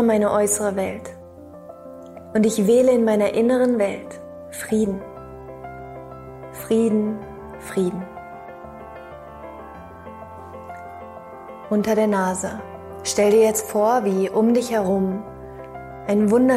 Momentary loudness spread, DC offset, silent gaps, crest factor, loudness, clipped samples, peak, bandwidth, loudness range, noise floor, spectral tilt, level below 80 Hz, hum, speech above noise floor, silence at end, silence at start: 21 LU; under 0.1%; none; 14 dB; -20 LUFS; under 0.1%; -8 dBFS; 16 kHz; 12 LU; -41 dBFS; -5.5 dB/octave; -54 dBFS; none; 22 dB; 0 s; 0 s